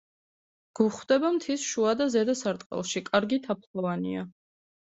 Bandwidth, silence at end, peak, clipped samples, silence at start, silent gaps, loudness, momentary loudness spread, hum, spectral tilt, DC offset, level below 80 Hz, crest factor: 8.2 kHz; 0.6 s; -10 dBFS; under 0.1%; 0.8 s; 2.66-2.70 s, 3.67-3.74 s; -28 LUFS; 9 LU; none; -4.5 dB/octave; under 0.1%; -70 dBFS; 20 dB